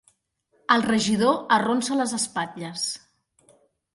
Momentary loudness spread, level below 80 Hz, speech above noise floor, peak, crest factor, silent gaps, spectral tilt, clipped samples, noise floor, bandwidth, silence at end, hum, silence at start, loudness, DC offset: 10 LU; -64 dBFS; 46 dB; -4 dBFS; 22 dB; none; -3.5 dB/octave; under 0.1%; -68 dBFS; 11.5 kHz; 1 s; none; 0.7 s; -23 LUFS; under 0.1%